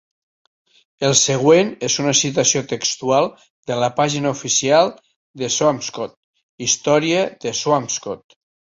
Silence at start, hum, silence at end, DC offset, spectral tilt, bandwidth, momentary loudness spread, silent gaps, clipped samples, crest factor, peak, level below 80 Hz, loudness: 1 s; none; 0.55 s; under 0.1%; -3 dB/octave; 8.2 kHz; 12 LU; 3.50-3.63 s, 5.16-5.34 s, 6.17-6.33 s, 6.43-6.58 s; under 0.1%; 18 dB; -2 dBFS; -60 dBFS; -18 LUFS